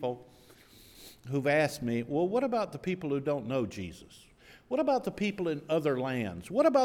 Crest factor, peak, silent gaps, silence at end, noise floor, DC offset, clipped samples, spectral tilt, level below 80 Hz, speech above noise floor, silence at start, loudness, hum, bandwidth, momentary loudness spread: 18 dB; -12 dBFS; none; 0 s; -57 dBFS; under 0.1%; under 0.1%; -6.5 dB/octave; -64 dBFS; 27 dB; 0 s; -31 LUFS; none; 18 kHz; 15 LU